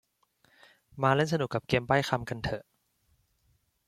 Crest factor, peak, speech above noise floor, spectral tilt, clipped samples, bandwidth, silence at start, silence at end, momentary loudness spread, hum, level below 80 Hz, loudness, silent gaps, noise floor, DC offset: 24 dB; -8 dBFS; 43 dB; -6 dB/octave; under 0.1%; 14.5 kHz; 0.95 s; 1.3 s; 9 LU; none; -58 dBFS; -29 LUFS; none; -72 dBFS; under 0.1%